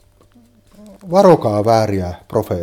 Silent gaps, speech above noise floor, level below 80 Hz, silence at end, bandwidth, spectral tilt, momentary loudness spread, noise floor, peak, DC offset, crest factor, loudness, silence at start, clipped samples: none; 35 dB; -48 dBFS; 0 s; 17 kHz; -7 dB/octave; 11 LU; -50 dBFS; 0 dBFS; under 0.1%; 16 dB; -15 LUFS; 1.05 s; under 0.1%